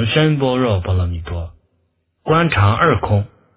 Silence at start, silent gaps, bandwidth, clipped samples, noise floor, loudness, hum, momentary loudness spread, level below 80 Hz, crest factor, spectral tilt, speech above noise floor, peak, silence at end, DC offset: 0 s; none; 4 kHz; under 0.1%; -65 dBFS; -16 LUFS; none; 14 LU; -30 dBFS; 16 dB; -10.5 dB/octave; 50 dB; 0 dBFS; 0.3 s; under 0.1%